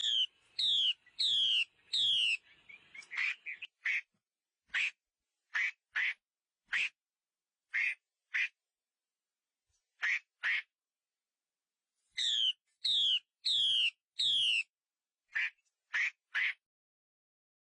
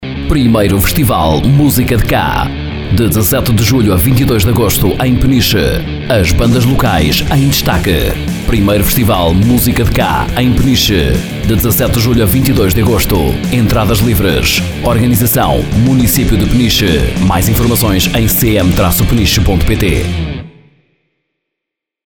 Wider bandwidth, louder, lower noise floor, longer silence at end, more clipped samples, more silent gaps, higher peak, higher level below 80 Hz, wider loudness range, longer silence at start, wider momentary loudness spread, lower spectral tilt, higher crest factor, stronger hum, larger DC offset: second, 10 kHz vs over 20 kHz; second, -32 LUFS vs -10 LUFS; first, under -90 dBFS vs -80 dBFS; second, 1.15 s vs 1.55 s; neither; first, 14.04-14.08 s, 14.70-14.74 s vs none; second, -22 dBFS vs 0 dBFS; second, under -90 dBFS vs -20 dBFS; first, 8 LU vs 1 LU; about the same, 0 s vs 0 s; first, 11 LU vs 4 LU; second, 3.5 dB/octave vs -5 dB/octave; about the same, 14 dB vs 10 dB; neither; second, under 0.1% vs 2%